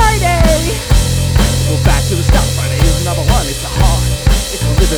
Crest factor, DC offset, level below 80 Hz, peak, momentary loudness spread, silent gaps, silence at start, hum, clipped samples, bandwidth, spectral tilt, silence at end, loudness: 12 dB; under 0.1%; -16 dBFS; 0 dBFS; 3 LU; none; 0 s; none; under 0.1%; 19 kHz; -4.5 dB/octave; 0 s; -13 LUFS